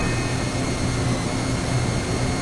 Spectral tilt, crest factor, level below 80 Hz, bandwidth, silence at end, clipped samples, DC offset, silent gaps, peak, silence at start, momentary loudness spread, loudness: -5 dB/octave; 14 dB; -34 dBFS; 11.5 kHz; 0 s; under 0.1%; under 0.1%; none; -10 dBFS; 0 s; 1 LU; -24 LUFS